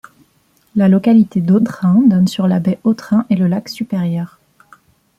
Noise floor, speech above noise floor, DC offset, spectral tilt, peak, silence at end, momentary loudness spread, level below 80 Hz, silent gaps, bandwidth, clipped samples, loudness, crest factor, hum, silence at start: -57 dBFS; 44 dB; under 0.1%; -8 dB/octave; -2 dBFS; 0.9 s; 10 LU; -56 dBFS; none; 12.5 kHz; under 0.1%; -14 LUFS; 12 dB; none; 0.75 s